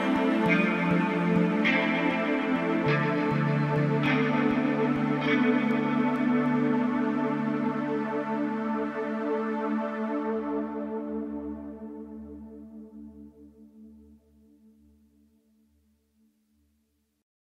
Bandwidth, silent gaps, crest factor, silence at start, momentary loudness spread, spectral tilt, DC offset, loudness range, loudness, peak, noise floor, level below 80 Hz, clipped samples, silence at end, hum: 8.8 kHz; none; 16 dB; 0 s; 17 LU; -8 dB/octave; under 0.1%; 14 LU; -27 LUFS; -12 dBFS; -73 dBFS; -62 dBFS; under 0.1%; 3.45 s; none